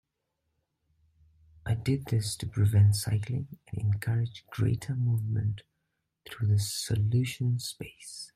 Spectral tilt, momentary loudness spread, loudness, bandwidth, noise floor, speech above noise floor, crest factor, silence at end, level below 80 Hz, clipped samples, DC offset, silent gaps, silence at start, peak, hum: -5.5 dB/octave; 15 LU; -29 LUFS; 15 kHz; -81 dBFS; 53 dB; 16 dB; 0.1 s; -56 dBFS; under 0.1%; under 0.1%; none; 1.65 s; -14 dBFS; none